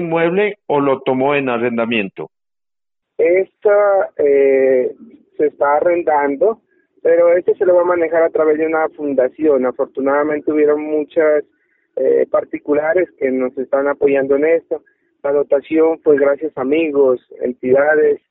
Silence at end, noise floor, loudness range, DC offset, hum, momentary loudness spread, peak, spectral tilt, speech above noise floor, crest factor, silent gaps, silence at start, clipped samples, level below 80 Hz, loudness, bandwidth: 0.15 s; under -90 dBFS; 2 LU; under 0.1%; none; 7 LU; 0 dBFS; -4.5 dB/octave; over 75 dB; 14 dB; none; 0 s; under 0.1%; -62 dBFS; -15 LUFS; 4 kHz